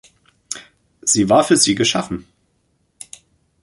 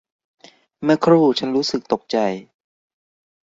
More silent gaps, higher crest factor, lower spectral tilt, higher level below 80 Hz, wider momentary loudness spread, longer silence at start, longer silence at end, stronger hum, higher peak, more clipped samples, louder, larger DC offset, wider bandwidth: neither; about the same, 20 dB vs 18 dB; second, -3 dB/octave vs -6 dB/octave; first, -52 dBFS vs -64 dBFS; first, 23 LU vs 10 LU; second, 0.5 s vs 0.8 s; first, 1.4 s vs 1.2 s; neither; about the same, -2 dBFS vs -2 dBFS; neither; first, -15 LUFS vs -19 LUFS; neither; first, 11.5 kHz vs 7.8 kHz